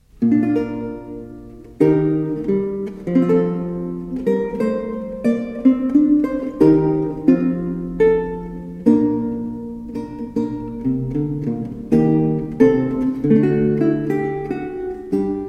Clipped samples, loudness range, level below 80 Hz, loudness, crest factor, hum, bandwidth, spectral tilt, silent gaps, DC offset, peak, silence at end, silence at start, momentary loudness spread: under 0.1%; 4 LU; -44 dBFS; -19 LUFS; 18 dB; none; 6.6 kHz; -10 dB/octave; none; under 0.1%; -2 dBFS; 0 s; 0.2 s; 13 LU